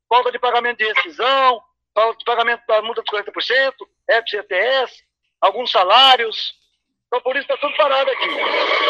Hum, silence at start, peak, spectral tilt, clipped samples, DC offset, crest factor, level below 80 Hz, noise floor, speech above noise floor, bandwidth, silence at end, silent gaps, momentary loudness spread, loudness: none; 0.1 s; 0 dBFS; -1 dB/octave; under 0.1%; under 0.1%; 18 dB; -72 dBFS; -68 dBFS; 51 dB; 11.5 kHz; 0 s; none; 10 LU; -17 LUFS